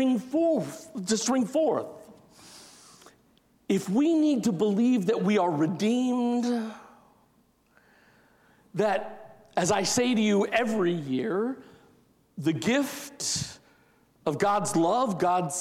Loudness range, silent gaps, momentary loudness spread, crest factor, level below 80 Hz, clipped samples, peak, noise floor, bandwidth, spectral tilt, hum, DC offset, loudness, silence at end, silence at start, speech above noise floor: 6 LU; none; 13 LU; 18 dB; -68 dBFS; under 0.1%; -10 dBFS; -65 dBFS; 15.5 kHz; -4.5 dB/octave; none; under 0.1%; -26 LUFS; 0 s; 0 s; 40 dB